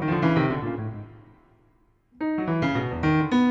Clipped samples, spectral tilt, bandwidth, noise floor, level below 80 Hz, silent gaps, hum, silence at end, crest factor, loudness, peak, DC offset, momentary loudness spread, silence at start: under 0.1%; -8 dB/octave; 7.6 kHz; -62 dBFS; -48 dBFS; none; none; 0 s; 16 dB; -25 LUFS; -10 dBFS; under 0.1%; 13 LU; 0 s